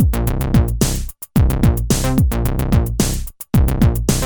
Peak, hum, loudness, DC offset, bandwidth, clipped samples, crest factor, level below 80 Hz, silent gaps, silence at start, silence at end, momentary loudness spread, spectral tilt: 0 dBFS; none; -17 LUFS; under 0.1%; over 20 kHz; under 0.1%; 16 dB; -20 dBFS; none; 0 s; 0 s; 5 LU; -6 dB/octave